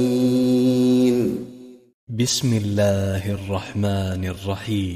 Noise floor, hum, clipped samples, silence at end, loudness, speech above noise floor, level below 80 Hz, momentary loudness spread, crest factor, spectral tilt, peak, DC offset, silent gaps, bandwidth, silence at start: -42 dBFS; none; under 0.1%; 0 s; -21 LUFS; 20 dB; -52 dBFS; 10 LU; 14 dB; -6 dB/octave; -8 dBFS; under 0.1%; 1.94-2.07 s; 15.5 kHz; 0 s